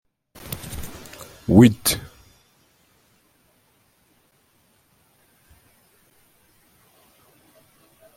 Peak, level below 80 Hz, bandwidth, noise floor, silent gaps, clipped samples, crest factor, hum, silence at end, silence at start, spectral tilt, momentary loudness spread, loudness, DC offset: -2 dBFS; -50 dBFS; 16.5 kHz; -62 dBFS; none; under 0.1%; 24 dB; none; 6.15 s; 0.5 s; -5.5 dB/octave; 27 LU; -19 LUFS; under 0.1%